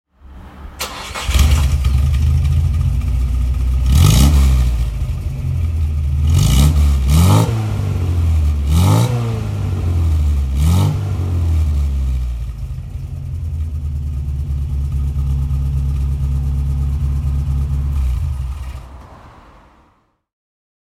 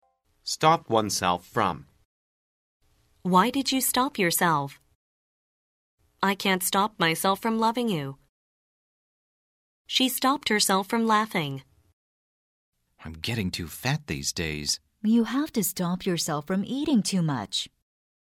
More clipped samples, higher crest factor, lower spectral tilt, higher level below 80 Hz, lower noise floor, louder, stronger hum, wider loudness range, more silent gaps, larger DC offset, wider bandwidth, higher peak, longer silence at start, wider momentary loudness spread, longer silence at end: neither; about the same, 16 dB vs 20 dB; first, -6 dB/octave vs -3.5 dB/octave; first, -18 dBFS vs -58 dBFS; second, -57 dBFS vs under -90 dBFS; first, -17 LUFS vs -25 LUFS; neither; first, 8 LU vs 3 LU; second, none vs 2.05-2.80 s, 4.95-5.98 s, 8.29-9.85 s, 11.93-12.72 s; neither; about the same, 15.5 kHz vs 16 kHz; first, 0 dBFS vs -6 dBFS; second, 0.25 s vs 0.45 s; first, 12 LU vs 9 LU; first, 1.55 s vs 0.55 s